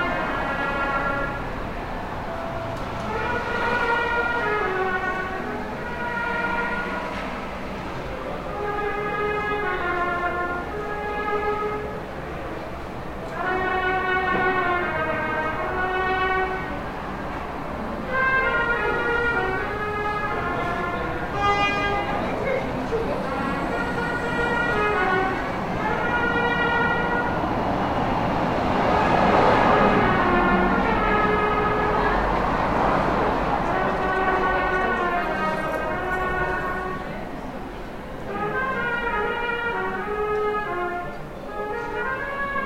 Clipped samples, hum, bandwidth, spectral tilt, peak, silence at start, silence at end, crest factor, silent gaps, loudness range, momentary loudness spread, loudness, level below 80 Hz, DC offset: under 0.1%; none; 16.5 kHz; -6 dB/octave; -6 dBFS; 0 s; 0 s; 18 dB; none; 7 LU; 11 LU; -24 LUFS; -38 dBFS; under 0.1%